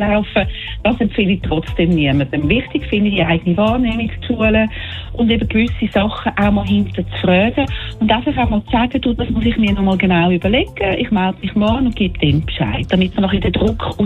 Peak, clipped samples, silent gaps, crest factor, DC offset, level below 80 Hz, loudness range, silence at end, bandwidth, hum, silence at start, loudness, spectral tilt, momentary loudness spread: -2 dBFS; under 0.1%; none; 14 dB; under 0.1%; -28 dBFS; 1 LU; 0 s; 4.4 kHz; none; 0 s; -16 LUFS; -8 dB/octave; 5 LU